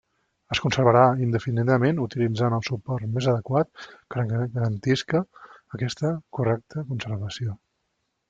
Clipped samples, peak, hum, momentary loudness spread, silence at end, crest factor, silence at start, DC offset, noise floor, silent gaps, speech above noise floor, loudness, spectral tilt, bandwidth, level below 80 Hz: under 0.1%; -4 dBFS; none; 12 LU; 0.75 s; 22 dB; 0.5 s; under 0.1%; -76 dBFS; none; 52 dB; -25 LUFS; -7 dB/octave; 7.6 kHz; -58 dBFS